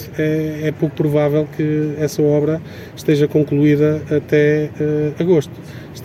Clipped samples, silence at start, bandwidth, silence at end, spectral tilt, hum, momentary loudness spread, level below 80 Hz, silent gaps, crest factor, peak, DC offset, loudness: under 0.1%; 0 s; 15 kHz; 0 s; -7.5 dB/octave; none; 8 LU; -50 dBFS; none; 14 dB; -2 dBFS; under 0.1%; -17 LUFS